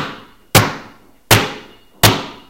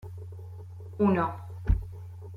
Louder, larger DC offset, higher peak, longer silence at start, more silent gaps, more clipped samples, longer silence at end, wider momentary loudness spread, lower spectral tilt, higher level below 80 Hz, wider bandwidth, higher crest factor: first, -14 LUFS vs -29 LUFS; first, 0.3% vs under 0.1%; first, 0 dBFS vs -12 dBFS; about the same, 0 s vs 0 s; neither; first, 0.2% vs under 0.1%; first, 0.15 s vs 0 s; about the same, 17 LU vs 18 LU; second, -3.5 dB/octave vs -10 dB/octave; about the same, -36 dBFS vs -36 dBFS; first, over 20 kHz vs 5.2 kHz; about the same, 18 dB vs 18 dB